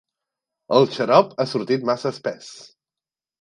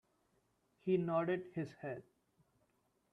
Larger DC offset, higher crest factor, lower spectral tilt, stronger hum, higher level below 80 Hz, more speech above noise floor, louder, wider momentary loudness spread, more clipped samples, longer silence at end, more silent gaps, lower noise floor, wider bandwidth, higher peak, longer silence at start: neither; about the same, 22 dB vs 18 dB; second, -6 dB/octave vs -9 dB/octave; neither; first, -72 dBFS vs -80 dBFS; first, over 70 dB vs 41 dB; first, -20 LUFS vs -39 LUFS; about the same, 13 LU vs 13 LU; neither; second, 0.8 s vs 1.1 s; neither; first, under -90 dBFS vs -79 dBFS; first, 10.5 kHz vs 6.4 kHz; first, 0 dBFS vs -24 dBFS; second, 0.7 s vs 0.85 s